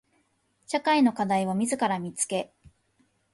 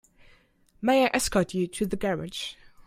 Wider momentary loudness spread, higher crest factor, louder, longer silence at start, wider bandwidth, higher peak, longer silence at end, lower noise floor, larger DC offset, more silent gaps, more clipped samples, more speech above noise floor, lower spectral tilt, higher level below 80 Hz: second, 9 LU vs 12 LU; about the same, 16 dB vs 20 dB; about the same, -26 LUFS vs -27 LUFS; about the same, 0.7 s vs 0.8 s; second, 11.5 kHz vs 16 kHz; second, -12 dBFS vs -8 dBFS; first, 0.9 s vs 0.05 s; first, -70 dBFS vs -61 dBFS; neither; neither; neither; first, 45 dB vs 35 dB; about the same, -4 dB/octave vs -4.5 dB/octave; second, -68 dBFS vs -50 dBFS